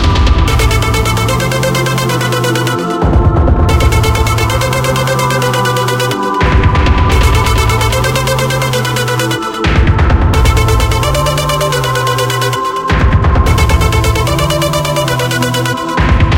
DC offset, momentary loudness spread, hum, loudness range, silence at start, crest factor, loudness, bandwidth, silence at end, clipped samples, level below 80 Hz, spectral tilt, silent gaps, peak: under 0.1%; 3 LU; none; 1 LU; 0 s; 10 dB; -11 LUFS; 17 kHz; 0 s; 0.1%; -16 dBFS; -5 dB/octave; none; 0 dBFS